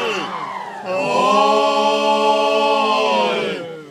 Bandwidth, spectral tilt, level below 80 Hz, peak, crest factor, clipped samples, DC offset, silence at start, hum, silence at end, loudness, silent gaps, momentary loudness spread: 13.5 kHz; -3.5 dB/octave; -72 dBFS; -2 dBFS; 14 dB; under 0.1%; under 0.1%; 0 s; none; 0 s; -17 LUFS; none; 12 LU